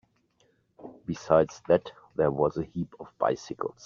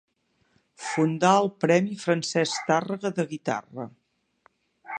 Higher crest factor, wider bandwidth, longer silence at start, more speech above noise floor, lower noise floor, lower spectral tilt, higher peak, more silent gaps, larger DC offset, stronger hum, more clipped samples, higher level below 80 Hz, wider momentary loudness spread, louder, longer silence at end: about the same, 22 dB vs 20 dB; second, 7.4 kHz vs 9.8 kHz; about the same, 0.85 s vs 0.8 s; about the same, 41 dB vs 44 dB; about the same, -69 dBFS vs -68 dBFS; first, -6.5 dB/octave vs -5 dB/octave; about the same, -6 dBFS vs -6 dBFS; neither; neither; neither; neither; first, -60 dBFS vs -76 dBFS; about the same, 14 LU vs 15 LU; second, -28 LUFS vs -25 LUFS; first, 0.15 s vs 0 s